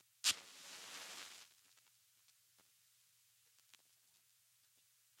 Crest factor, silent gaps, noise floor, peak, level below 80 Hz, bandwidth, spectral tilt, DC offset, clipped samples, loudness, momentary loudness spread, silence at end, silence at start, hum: 32 dB; none; -74 dBFS; -20 dBFS; under -90 dBFS; 16.5 kHz; 2.5 dB/octave; under 0.1%; under 0.1%; -43 LUFS; 20 LU; 2.6 s; 0.25 s; none